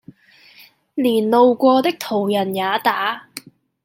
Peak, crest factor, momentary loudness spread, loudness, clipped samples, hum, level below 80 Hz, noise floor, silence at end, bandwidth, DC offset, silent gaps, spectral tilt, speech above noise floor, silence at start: -2 dBFS; 16 dB; 17 LU; -17 LUFS; under 0.1%; none; -70 dBFS; -49 dBFS; 0.45 s; 17 kHz; under 0.1%; none; -5 dB/octave; 33 dB; 0.95 s